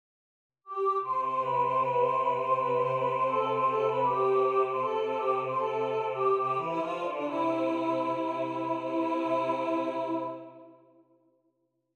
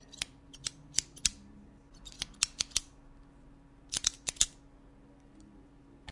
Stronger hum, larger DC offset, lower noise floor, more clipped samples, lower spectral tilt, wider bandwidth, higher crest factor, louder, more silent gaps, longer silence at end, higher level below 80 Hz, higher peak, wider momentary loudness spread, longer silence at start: neither; neither; first, -75 dBFS vs -57 dBFS; neither; first, -7 dB/octave vs 0.5 dB/octave; second, 8.6 kHz vs 11.5 kHz; second, 14 dB vs 34 dB; first, -29 LUFS vs -33 LUFS; neither; first, 1.25 s vs 0 s; second, -82 dBFS vs -56 dBFS; second, -16 dBFS vs -6 dBFS; second, 6 LU vs 17 LU; first, 0.65 s vs 0.15 s